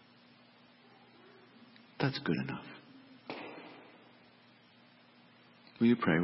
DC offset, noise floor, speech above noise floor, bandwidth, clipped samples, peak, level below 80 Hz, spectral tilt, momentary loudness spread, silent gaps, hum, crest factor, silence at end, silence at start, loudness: under 0.1%; -62 dBFS; 31 dB; 5.6 kHz; under 0.1%; -16 dBFS; -74 dBFS; -5.5 dB/octave; 29 LU; none; 60 Hz at -65 dBFS; 22 dB; 0 s; 2 s; -34 LUFS